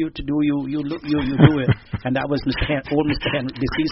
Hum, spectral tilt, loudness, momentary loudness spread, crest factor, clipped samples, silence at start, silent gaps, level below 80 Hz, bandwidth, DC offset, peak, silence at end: none; -6 dB/octave; -21 LUFS; 9 LU; 20 dB; under 0.1%; 0 s; none; -38 dBFS; 6 kHz; under 0.1%; 0 dBFS; 0 s